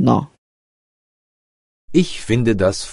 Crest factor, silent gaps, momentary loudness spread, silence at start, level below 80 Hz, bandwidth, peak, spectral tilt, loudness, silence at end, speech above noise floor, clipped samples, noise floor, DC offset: 20 dB; 0.38-1.88 s; 4 LU; 0 s; -42 dBFS; 11.5 kHz; 0 dBFS; -6 dB/octave; -18 LUFS; 0 s; over 74 dB; under 0.1%; under -90 dBFS; under 0.1%